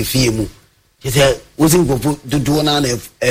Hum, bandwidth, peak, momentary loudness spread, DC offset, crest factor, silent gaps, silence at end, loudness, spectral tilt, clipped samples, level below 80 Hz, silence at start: none; 16 kHz; -2 dBFS; 8 LU; under 0.1%; 14 dB; none; 0 s; -15 LUFS; -4.5 dB/octave; under 0.1%; -34 dBFS; 0 s